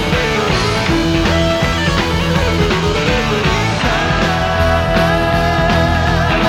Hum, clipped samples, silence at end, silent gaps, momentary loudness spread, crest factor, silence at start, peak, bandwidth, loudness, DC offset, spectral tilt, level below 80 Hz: none; under 0.1%; 0 s; none; 1 LU; 14 dB; 0 s; 0 dBFS; 16.5 kHz; -14 LUFS; under 0.1%; -5 dB/octave; -24 dBFS